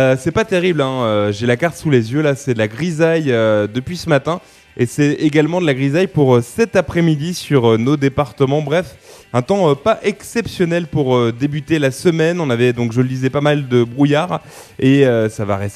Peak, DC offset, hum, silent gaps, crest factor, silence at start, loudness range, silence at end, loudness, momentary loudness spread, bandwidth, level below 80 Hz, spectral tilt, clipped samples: 0 dBFS; under 0.1%; none; none; 14 dB; 0 s; 2 LU; 0 s; -16 LUFS; 7 LU; 13.5 kHz; -48 dBFS; -6.5 dB/octave; under 0.1%